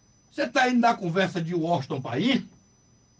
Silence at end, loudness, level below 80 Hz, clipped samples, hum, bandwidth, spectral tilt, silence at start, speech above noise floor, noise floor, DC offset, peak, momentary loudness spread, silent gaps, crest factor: 0.7 s; -25 LUFS; -68 dBFS; under 0.1%; none; 9 kHz; -5.5 dB/octave; 0.35 s; 36 dB; -60 dBFS; under 0.1%; -8 dBFS; 8 LU; none; 18 dB